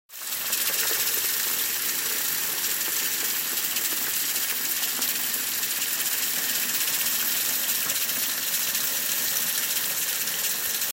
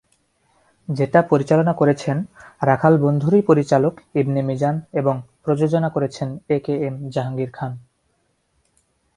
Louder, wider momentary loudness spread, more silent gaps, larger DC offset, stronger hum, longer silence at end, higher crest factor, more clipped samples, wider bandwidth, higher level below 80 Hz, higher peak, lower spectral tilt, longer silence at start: second, -23 LUFS vs -20 LUFS; second, 2 LU vs 11 LU; neither; neither; neither; second, 0 s vs 1.35 s; about the same, 20 dB vs 20 dB; neither; first, 16 kHz vs 11 kHz; second, -70 dBFS vs -58 dBFS; second, -8 dBFS vs 0 dBFS; second, 1.5 dB/octave vs -8.5 dB/octave; second, 0.1 s vs 0.9 s